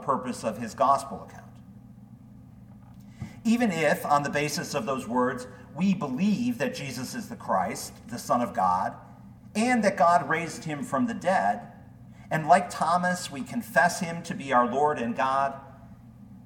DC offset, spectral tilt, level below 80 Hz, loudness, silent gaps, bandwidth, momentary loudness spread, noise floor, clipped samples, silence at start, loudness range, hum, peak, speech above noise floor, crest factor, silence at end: under 0.1%; -5 dB/octave; -60 dBFS; -26 LUFS; none; 18 kHz; 14 LU; -49 dBFS; under 0.1%; 0 s; 4 LU; none; -6 dBFS; 22 dB; 22 dB; 0 s